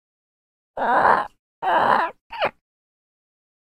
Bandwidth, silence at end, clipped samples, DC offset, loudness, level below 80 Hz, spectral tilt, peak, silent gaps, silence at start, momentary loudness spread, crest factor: 14 kHz; 1.25 s; under 0.1%; under 0.1%; -21 LUFS; -60 dBFS; -5 dB/octave; -2 dBFS; 1.39-1.62 s, 2.21-2.30 s; 0.75 s; 11 LU; 22 dB